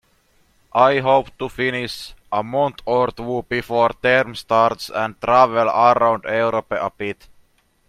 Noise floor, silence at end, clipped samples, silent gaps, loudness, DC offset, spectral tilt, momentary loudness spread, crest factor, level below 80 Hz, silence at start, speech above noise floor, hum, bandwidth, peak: -59 dBFS; 0.75 s; under 0.1%; none; -19 LUFS; under 0.1%; -5.5 dB/octave; 11 LU; 20 dB; -52 dBFS; 0.75 s; 41 dB; none; 15 kHz; 0 dBFS